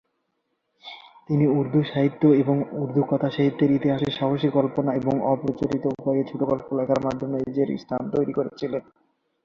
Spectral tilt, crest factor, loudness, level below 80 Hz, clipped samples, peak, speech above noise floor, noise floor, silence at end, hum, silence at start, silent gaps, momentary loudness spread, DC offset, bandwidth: -9 dB/octave; 16 dB; -23 LUFS; -58 dBFS; under 0.1%; -6 dBFS; 52 dB; -75 dBFS; 0.65 s; none; 0.85 s; none; 8 LU; under 0.1%; 7 kHz